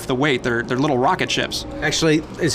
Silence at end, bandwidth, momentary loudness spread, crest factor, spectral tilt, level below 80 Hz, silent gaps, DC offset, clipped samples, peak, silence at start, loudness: 0 s; 15.5 kHz; 3 LU; 14 dB; -4 dB/octave; -42 dBFS; none; under 0.1%; under 0.1%; -6 dBFS; 0 s; -19 LUFS